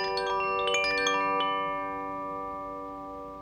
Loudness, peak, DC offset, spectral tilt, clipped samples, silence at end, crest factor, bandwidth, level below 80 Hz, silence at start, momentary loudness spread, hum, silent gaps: -29 LUFS; -14 dBFS; under 0.1%; -2 dB/octave; under 0.1%; 0 s; 18 dB; 17.5 kHz; -58 dBFS; 0 s; 13 LU; none; none